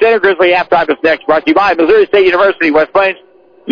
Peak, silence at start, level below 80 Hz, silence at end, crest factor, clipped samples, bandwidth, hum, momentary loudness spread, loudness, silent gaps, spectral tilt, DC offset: -2 dBFS; 0 s; -46 dBFS; 0 s; 8 dB; under 0.1%; 5.4 kHz; none; 4 LU; -10 LUFS; none; -6 dB/octave; under 0.1%